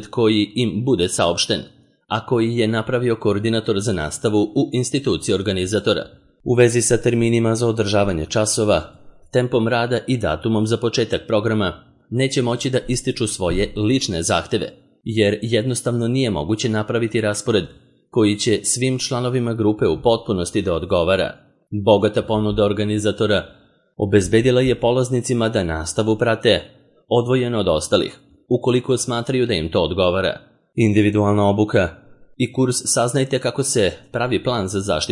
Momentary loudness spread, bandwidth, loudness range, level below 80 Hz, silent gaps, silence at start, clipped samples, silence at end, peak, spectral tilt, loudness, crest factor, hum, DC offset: 5 LU; 11.5 kHz; 2 LU; -44 dBFS; none; 0 s; under 0.1%; 0 s; -2 dBFS; -5 dB/octave; -19 LUFS; 18 dB; none; under 0.1%